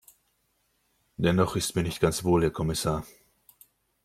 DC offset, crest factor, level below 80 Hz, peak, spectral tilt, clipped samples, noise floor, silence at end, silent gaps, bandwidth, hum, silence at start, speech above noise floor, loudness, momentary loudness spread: under 0.1%; 20 dB; -50 dBFS; -8 dBFS; -5.5 dB/octave; under 0.1%; -72 dBFS; 0.95 s; none; 16 kHz; none; 1.2 s; 47 dB; -27 LUFS; 9 LU